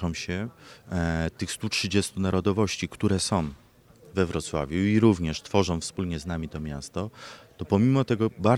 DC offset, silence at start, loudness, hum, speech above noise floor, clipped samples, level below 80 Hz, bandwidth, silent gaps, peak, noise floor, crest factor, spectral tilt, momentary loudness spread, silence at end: under 0.1%; 0 s; -27 LUFS; none; 28 dB; under 0.1%; -46 dBFS; 15 kHz; none; -6 dBFS; -54 dBFS; 20 dB; -5.5 dB/octave; 12 LU; 0 s